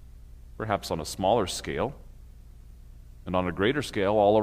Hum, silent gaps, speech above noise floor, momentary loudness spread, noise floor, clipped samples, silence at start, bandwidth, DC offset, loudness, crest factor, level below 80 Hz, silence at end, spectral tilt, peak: 60 Hz at -50 dBFS; none; 21 dB; 11 LU; -47 dBFS; under 0.1%; 0.05 s; 15.5 kHz; under 0.1%; -27 LUFS; 18 dB; -46 dBFS; 0 s; -5 dB/octave; -10 dBFS